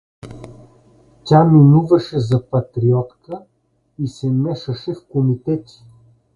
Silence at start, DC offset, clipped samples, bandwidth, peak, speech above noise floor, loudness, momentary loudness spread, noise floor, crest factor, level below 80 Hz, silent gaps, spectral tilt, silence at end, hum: 0.25 s; under 0.1%; under 0.1%; 7.2 kHz; 0 dBFS; 43 dB; -16 LUFS; 23 LU; -58 dBFS; 16 dB; -50 dBFS; none; -9.5 dB/octave; 0.75 s; none